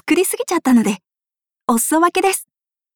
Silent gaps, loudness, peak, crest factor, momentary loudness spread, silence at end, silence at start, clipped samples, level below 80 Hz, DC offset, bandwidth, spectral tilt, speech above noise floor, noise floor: none; -17 LUFS; -4 dBFS; 14 dB; 9 LU; 0.55 s; 0.05 s; under 0.1%; -60 dBFS; under 0.1%; over 20 kHz; -3.5 dB/octave; 73 dB; -89 dBFS